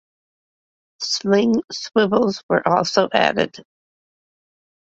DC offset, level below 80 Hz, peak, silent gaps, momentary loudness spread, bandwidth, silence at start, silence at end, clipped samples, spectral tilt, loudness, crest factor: under 0.1%; -60 dBFS; -2 dBFS; 1.64-1.68 s, 2.43-2.49 s; 6 LU; 8 kHz; 1 s; 1.25 s; under 0.1%; -4.5 dB/octave; -19 LUFS; 20 dB